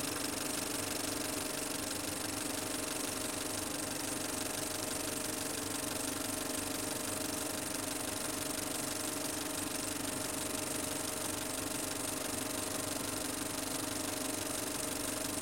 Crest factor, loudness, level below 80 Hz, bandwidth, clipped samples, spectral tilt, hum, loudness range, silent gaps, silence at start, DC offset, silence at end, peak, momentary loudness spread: 18 dB; -36 LUFS; -62 dBFS; 17 kHz; under 0.1%; -2 dB/octave; none; 0 LU; none; 0 s; under 0.1%; 0 s; -20 dBFS; 1 LU